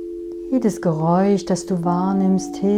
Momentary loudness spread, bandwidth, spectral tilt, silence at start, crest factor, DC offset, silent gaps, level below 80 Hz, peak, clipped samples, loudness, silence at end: 6 LU; 11.5 kHz; -7.5 dB/octave; 0 s; 12 dB; under 0.1%; none; -52 dBFS; -6 dBFS; under 0.1%; -19 LUFS; 0 s